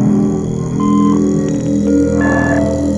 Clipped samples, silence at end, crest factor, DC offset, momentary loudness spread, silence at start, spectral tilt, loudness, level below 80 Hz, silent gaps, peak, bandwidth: under 0.1%; 0 s; 12 dB; under 0.1%; 4 LU; 0 s; -7.5 dB/octave; -14 LUFS; -32 dBFS; none; 0 dBFS; 10.5 kHz